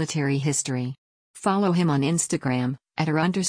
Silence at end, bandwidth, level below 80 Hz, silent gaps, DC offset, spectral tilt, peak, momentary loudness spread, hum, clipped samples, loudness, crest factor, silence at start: 0 s; 10.5 kHz; -62 dBFS; 0.98-1.34 s; under 0.1%; -5 dB/octave; -10 dBFS; 8 LU; none; under 0.1%; -24 LUFS; 14 dB; 0 s